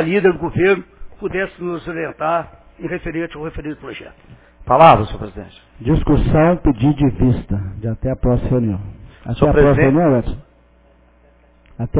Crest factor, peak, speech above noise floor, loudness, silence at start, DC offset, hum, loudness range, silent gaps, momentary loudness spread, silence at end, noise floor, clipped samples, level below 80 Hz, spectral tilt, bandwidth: 16 dB; 0 dBFS; 35 dB; -16 LUFS; 0 s; under 0.1%; none; 9 LU; none; 19 LU; 0 s; -51 dBFS; under 0.1%; -30 dBFS; -11.5 dB/octave; 4 kHz